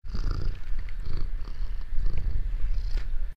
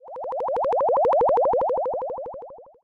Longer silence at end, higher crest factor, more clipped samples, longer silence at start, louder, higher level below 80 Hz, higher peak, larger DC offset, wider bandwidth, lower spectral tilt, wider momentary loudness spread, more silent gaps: second, 0 s vs 0.2 s; about the same, 12 dB vs 8 dB; neither; about the same, 0 s vs 0.05 s; second, -36 LUFS vs -22 LUFS; first, -26 dBFS vs -56 dBFS; about the same, -12 dBFS vs -14 dBFS; first, 2% vs under 0.1%; about the same, 5.4 kHz vs 5.4 kHz; about the same, -7 dB/octave vs -7.5 dB/octave; second, 5 LU vs 14 LU; neither